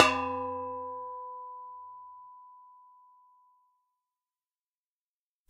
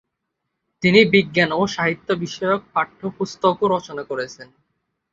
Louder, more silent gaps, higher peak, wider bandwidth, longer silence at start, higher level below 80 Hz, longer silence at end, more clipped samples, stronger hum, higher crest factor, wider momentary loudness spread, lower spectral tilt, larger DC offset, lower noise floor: second, -34 LUFS vs -19 LUFS; neither; about the same, -2 dBFS vs -2 dBFS; first, 11.5 kHz vs 7.8 kHz; second, 0 s vs 0.8 s; second, -76 dBFS vs -58 dBFS; first, 2.7 s vs 0.7 s; neither; neither; first, 34 dB vs 20 dB; first, 21 LU vs 13 LU; second, -2.5 dB/octave vs -5.5 dB/octave; neither; first, under -90 dBFS vs -78 dBFS